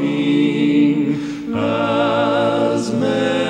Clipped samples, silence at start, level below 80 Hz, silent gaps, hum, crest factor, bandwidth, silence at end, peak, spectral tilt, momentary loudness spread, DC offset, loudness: under 0.1%; 0 s; -56 dBFS; none; none; 12 dB; 9.6 kHz; 0 s; -6 dBFS; -6.5 dB/octave; 6 LU; under 0.1%; -17 LUFS